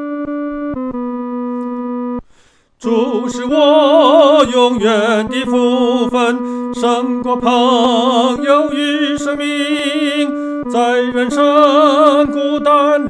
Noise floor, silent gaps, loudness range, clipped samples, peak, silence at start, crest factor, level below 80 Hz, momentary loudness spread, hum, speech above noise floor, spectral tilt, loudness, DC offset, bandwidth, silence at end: -50 dBFS; none; 4 LU; under 0.1%; 0 dBFS; 0 s; 14 dB; -48 dBFS; 12 LU; none; 38 dB; -4 dB/octave; -13 LUFS; under 0.1%; 11 kHz; 0 s